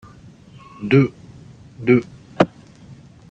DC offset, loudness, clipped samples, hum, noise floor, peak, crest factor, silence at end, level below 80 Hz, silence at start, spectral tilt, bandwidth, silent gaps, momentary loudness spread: under 0.1%; -19 LUFS; under 0.1%; none; -44 dBFS; 0 dBFS; 22 dB; 0.85 s; -54 dBFS; 0.8 s; -8.5 dB/octave; 8 kHz; none; 13 LU